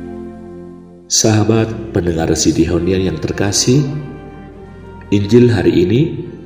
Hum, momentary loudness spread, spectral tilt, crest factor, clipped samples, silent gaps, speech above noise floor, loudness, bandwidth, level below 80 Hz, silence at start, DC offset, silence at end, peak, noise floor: none; 23 LU; -5 dB/octave; 14 dB; under 0.1%; none; 22 dB; -14 LUFS; 16 kHz; -36 dBFS; 0 s; 0.1%; 0 s; 0 dBFS; -35 dBFS